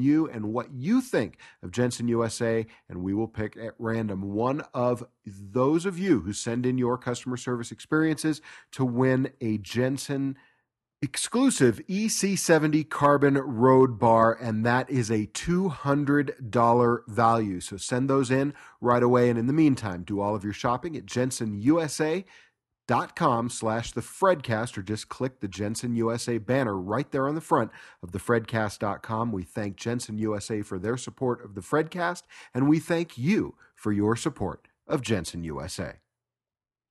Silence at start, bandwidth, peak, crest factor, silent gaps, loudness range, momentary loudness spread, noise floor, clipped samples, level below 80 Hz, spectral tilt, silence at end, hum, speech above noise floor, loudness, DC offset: 0 s; 12.5 kHz; -6 dBFS; 20 dB; none; 7 LU; 12 LU; under -90 dBFS; under 0.1%; -58 dBFS; -6 dB/octave; 1 s; none; over 64 dB; -26 LUFS; under 0.1%